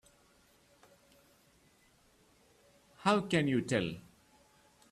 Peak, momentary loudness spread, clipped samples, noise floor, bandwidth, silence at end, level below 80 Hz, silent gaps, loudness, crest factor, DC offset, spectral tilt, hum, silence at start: -14 dBFS; 10 LU; under 0.1%; -67 dBFS; 14 kHz; 0.9 s; -70 dBFS; none; -32 LUFS; 24 dB; under 0.1%; -5.5 dB/octave; none; 3 s